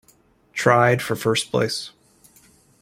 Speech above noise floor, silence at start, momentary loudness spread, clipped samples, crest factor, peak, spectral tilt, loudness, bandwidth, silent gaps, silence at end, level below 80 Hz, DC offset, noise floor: 38 dB; 0.55 s; 14 LU; under 0.1%; 22 dB; -2 dBFS; -4.5 dB/octave; -20 LUFS; 16.5 kHz; none; 0.9 s; -60 dBFS; under 0.1%; -58 dBFS